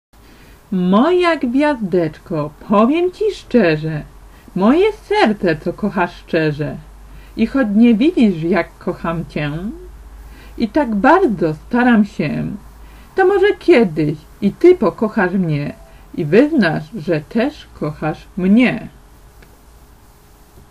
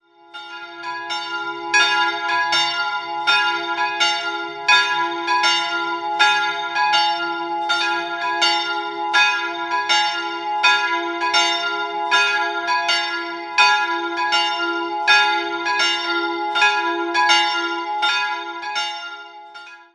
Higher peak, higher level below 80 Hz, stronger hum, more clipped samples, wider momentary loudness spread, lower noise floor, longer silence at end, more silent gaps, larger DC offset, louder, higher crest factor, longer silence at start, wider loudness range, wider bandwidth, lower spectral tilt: about the same, 0 dBFS vs -2 dBFS; first, -42 dBFS vs -72 dBFS; neither; neither; about the same, 13 LU vs 11 LU; first, -45 dBFS vs -40 dBFS; first, 1.8 s vs 0.1 s; neither; neither; about the same, -16 LUFS vs -18 LUFS; about the same, 16 dB vs 18 dB; first, 0.7 s vs 0.35 s; about the same, 3 LU vs 1 LU; first, 13 kHz vs 11.5 kHz; first, -7.5 dB/octave vs 0 dB/octave